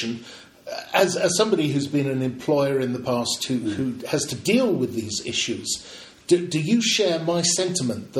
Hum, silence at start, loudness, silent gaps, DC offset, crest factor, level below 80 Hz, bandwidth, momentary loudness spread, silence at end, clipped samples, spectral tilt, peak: none; 0 s; -23 LUFS; none; under 0.1%; 18 dB; -62 dBFS; 16.5 kHz; 10 LU; 0 s; under 0.1%; -4 dB/octave; -4 dBFS